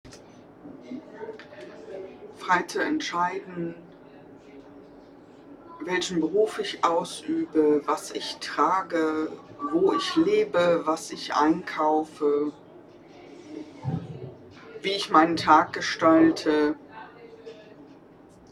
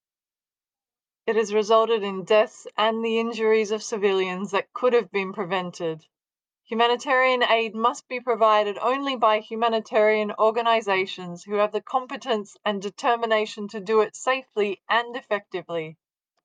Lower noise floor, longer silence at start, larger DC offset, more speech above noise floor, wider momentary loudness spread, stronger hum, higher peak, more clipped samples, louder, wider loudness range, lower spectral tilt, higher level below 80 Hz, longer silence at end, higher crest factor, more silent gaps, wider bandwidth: second, -51 dBFS vs under -90 dBFS; second, 0.05 s vs 1.25 s; neither; second, 27 dB vs over 67 dB; first, 23 LU vs 10 LU; neither; about the same, -4 dBFS vs -6 dBFS; neither; about the same, -25 LUFS vs -23 LUFS; first, 8 LU vs 3 LU; about the same, -4.5 dB/octave vs -4 dB/octave; first, -64 dBFS vs -84 dBFS; about the same, 0.6 s vs 0.5 s; about the same, 22 dB vs 18 dB; neither; first, 12.5 kHz vs 9.6 kHz